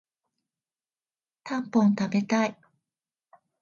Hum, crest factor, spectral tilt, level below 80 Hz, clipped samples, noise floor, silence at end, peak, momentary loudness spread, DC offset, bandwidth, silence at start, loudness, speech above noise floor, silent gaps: none; 18 dB; -6.5 dB/octave; -74 dBFS; under 0.1%; under -90 dBFS; 1.1 s; -10 dBFS; 10 LU; under 0.1%; 7.2 kHz; 1.45 s; -26 LUFS; over 66 dB; none